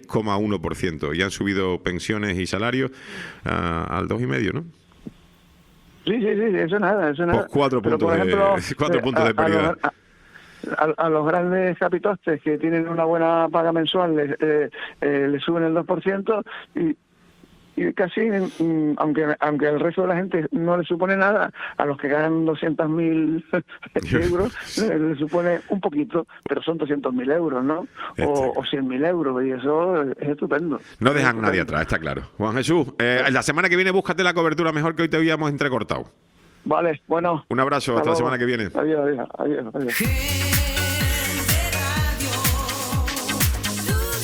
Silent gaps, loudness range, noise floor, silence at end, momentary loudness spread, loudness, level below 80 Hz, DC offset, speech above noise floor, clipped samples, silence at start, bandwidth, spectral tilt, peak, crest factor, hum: none; 4 LU; -53 dBFS; 0 s; 7 LU; -22 LUFS; -38 dBFS; under 0.1%; 32 dB; under 0.1%; 0.1 s; over 20 kHz; -5 dB/octave; -2 dBFS; 20 dB; none